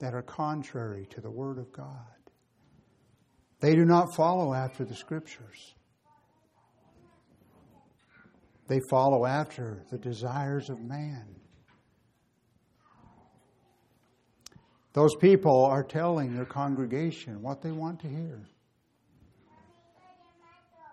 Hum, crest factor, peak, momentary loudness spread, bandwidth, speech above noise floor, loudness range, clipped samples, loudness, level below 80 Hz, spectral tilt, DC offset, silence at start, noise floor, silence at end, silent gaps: none; 22 dB; -8 dBFS; 20 LU; 12.5 kHz; 43 dB; 16 LU; under 0.1%; -28 LUFS; -72 dBFS; -7.5 dB/octave; under 0.1%; 0 s; -71 dBFS; 2.5 s; none